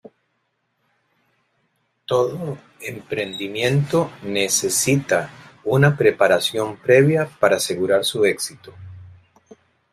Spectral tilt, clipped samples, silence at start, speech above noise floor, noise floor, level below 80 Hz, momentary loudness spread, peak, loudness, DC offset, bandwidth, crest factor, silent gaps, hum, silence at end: -4.5 dB/octave; under 0.1%; 2.1 s; 52 dB; -71 dBFS; -60 dBFS; 16 LU; 0 dBFS; -19 LUFS; under 0.1%; 16 kHz; 20 dB; none; none; 0.85 s